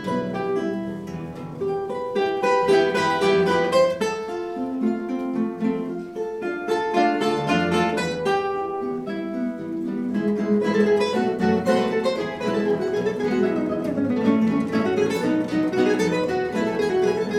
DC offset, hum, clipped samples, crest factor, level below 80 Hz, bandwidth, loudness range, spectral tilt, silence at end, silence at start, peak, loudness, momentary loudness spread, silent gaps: under 0.1%; none; under 0.1%; 16 dB; -58 dBFS; 14 kHz; 3 LU; -6 dB/octave; 0 s; 0 s; -6 dBFS; -23 LUFS; 9 LU; none